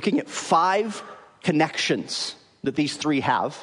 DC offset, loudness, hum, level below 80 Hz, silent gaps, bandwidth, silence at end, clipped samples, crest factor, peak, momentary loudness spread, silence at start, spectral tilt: under 0.1%; -24 LUFS; none; -70 dBFS; none; 11 kHz; 0 s; under 0.1%; 18 dB; -6 dBFS; 11 LU; 0 s; -4 dB/octave